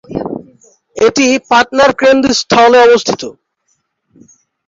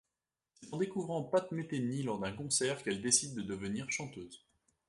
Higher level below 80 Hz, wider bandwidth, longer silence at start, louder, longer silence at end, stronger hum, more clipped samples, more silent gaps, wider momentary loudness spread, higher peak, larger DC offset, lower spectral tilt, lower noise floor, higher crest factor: first, -48 dBFS vs -68 dBFS; second, 7.8 kHz vs 11.5 kHz; second, 0.1 s vs 0.6 s; first, -9 LUFS vs -35 LUFS; first, 1.35 s vs 0.5 s; neither; neither; neither; first, 18 LU vs 11 LU; first, 0 dBFS vs -12 dBFS; neither; about the same, -3 dB/octave vs -3.5 dB/octave; second, -63 dBFS vs under -90 dBFS; second, 12 dB vs 26 dB